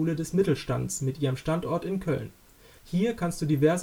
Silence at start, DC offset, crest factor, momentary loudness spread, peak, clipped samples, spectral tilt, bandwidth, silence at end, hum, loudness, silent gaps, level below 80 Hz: 0 s; under 0.1%; 16 dB; 6 LU; -10 dBFS; under 0.1%; -6.5 dB/octave; 20 kHz; 0 s; none; -28 LUFS; none; -52 dBFS